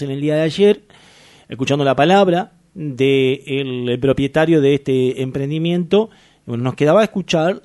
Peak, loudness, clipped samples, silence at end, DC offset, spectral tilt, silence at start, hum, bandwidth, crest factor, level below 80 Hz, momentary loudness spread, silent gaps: -2 dBFS; -16 LUFS; under 0.1%; 0.05 s; under 0.1%; -6.5 dB/octave; 0 s; none; 11.5 kHz; 16 dB; -50 dBFS; 10 LU; none